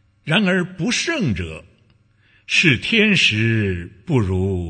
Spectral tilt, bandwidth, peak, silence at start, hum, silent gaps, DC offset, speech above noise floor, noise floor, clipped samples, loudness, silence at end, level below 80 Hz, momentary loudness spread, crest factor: -4.5 dB/octave; 9.6 kHz; 0 dBFS; 0.25 s; none; none; under 0.1%; 38 dB; -57 dBFS; under 0.1%; -18 LUFS; 0 s; -46 dBFS; 11 LU; 18 dB